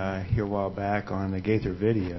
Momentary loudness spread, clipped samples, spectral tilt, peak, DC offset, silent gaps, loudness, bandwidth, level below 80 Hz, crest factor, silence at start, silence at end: 3 LU; under 0.1%; -9 dB/octave; -12 dBFS; under 0.1%; none; -28 LUFS; 6 kHz; -42 dBFS; 16 dB; 0 s; 0 s